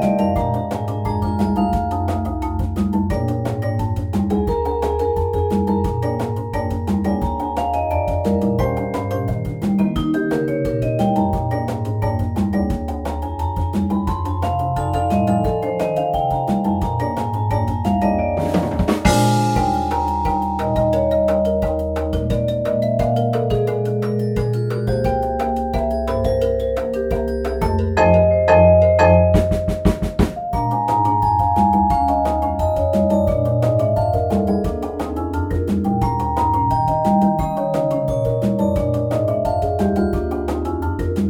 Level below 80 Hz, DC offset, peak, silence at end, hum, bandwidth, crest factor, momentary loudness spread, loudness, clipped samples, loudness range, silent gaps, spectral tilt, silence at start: -30 dBFS; under 0.1%; 0 dBFS; 0 s; none; 17 kHz; 18 dB; 6 LU; -19 LUFS; under 0.1%; 5 LU; none; -8 dB/octave; 0 s